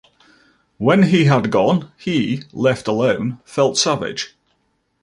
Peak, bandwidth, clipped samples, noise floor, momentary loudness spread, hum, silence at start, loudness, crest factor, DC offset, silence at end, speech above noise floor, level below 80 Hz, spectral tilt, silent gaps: -2 dBFS; 11.5 kHz; under 0.1%; -66 dBFS; 10 LU; none; 0.8 s; -17 LUFS; 16 dB; under 0.1%; 0.75 s; 50 dB; -56 dBFS; -5.5 dB/octave; none